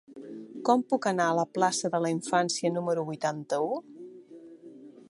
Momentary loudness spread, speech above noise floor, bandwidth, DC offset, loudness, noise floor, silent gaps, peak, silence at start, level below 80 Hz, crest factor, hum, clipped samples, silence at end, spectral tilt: 22 LU; 22 dB; 11.5 kHz; under 0.1%; -28 LUFS; -49 dBFS; none; -10 dBFS; 0.1 s; -80 dBFS; 20 dB; none; under 0.1%; 0.1 s; -4.5 dB/octave